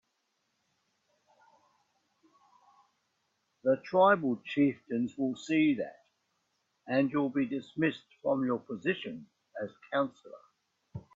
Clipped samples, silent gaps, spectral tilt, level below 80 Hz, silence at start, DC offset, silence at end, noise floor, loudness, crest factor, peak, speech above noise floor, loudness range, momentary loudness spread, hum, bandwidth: under 0.1%; none; -7 dB/octave; -76 dBFS; 3.65 s; under 0.1%; 0.15 s; -79 dBFS; -31 LUFS; 22 dB; -12 dBFS; 49 dB; 5 LU; 16 LU; none; 7.6 kHz